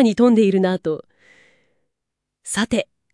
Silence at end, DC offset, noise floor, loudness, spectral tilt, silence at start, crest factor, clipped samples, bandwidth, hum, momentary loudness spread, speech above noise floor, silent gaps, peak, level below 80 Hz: 0.3 s; under 0.1%; -81 dBFS; -19 LUFS; -5.5 dB/octave; 0 s; 16 dB; under 0.1%; 12 kHz; none; 14 LU; 64 dB; none; -4 dBFS; -56 dBFS